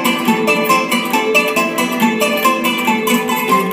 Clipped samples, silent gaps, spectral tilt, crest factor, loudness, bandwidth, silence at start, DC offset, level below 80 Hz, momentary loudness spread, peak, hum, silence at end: under 0.1%; none; -3.5 dB/octave; 14 dB; -14 LUFS; 16.5 kHz; 0 s; under 0.1%; -58 dBFS; 2 LU; -2 dBFS; none; 0 s